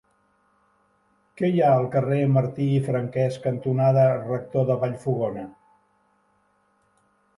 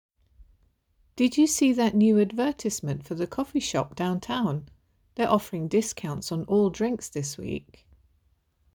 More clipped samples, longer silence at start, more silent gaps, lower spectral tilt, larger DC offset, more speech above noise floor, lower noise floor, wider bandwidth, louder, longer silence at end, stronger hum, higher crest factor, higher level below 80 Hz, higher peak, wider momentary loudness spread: neither; first, 1.4 s vs 1.15 s; neither; first, -9.5 dB/octave vs -5 dB/octave; neither; about the same, 44 dB vs 43 dB; about the same, -66 dBFS vs -68 dBFS; second, 11.5 kHz vs over 20 kHz; first, -23 LUFS vs -26 LUFS; first, 1.9 s vs 1.15 s; neither; about the same, 16 dB vs 18 dB; second, -64 dBFS vs -58 dBFS; about the same, -8 dBFS vs -8 dBFS; second, 8 LU vs 12 LU